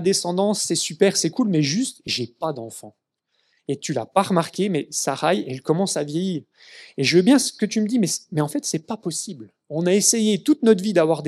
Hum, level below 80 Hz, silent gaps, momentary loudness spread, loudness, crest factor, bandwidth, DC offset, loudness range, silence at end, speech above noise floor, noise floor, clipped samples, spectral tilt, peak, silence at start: none; -74 dBFS; none; 12 LU; -21 LUFS; 20 dB; 14.5 kHz; under 0.1%; 4 LU; 0 s; 49 dB; -70 dBFS; under 0.1%; -4 dB/octave; -2 dBFS; 0 s